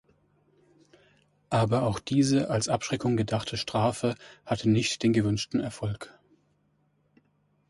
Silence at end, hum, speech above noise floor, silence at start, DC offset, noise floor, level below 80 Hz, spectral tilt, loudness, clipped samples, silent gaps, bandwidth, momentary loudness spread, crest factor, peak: 1.6 s; none; 43 dB; 1.5 s; under 0.1%; -70 dBFS; -56 dBFS; -5.5 dB/octave; -27 LUFS; under 0.1%; none; 11.5 kHz; 9 LU; 18 dB; -12 dBFS